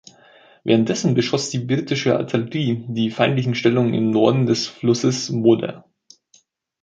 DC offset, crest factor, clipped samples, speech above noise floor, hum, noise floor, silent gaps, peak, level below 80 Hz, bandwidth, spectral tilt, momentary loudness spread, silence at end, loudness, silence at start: under 0.1%; 18 dB; under 0.1%; 40 dB; none; -58 dBFS; none; -2 dBFS; -60 dBFS; 9.2 kHz; -5.5 dB/octave; 6 LU; 1.05 s; -19 LUFS; 0.65 s